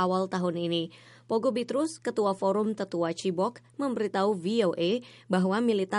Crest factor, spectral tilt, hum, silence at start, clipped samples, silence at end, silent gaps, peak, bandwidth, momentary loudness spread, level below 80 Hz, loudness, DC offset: 14 dB; -6 dB/octave; none; 0 s; under 0.1%; 0 s; none; -14 dBFS; 11.5 kHz; 5 LU; -76 dBFS; -29 LUFS; under 0.1%